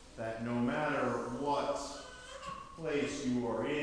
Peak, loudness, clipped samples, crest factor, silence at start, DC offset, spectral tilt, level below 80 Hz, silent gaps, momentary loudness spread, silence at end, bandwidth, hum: -22 dBFS; -36 LUFS; under 0.1%; 14 dB; 0 s; under 0.1%; -5 dB/octave; -60 dBFS; none; 12 LU; 0 s; 11 kHz; none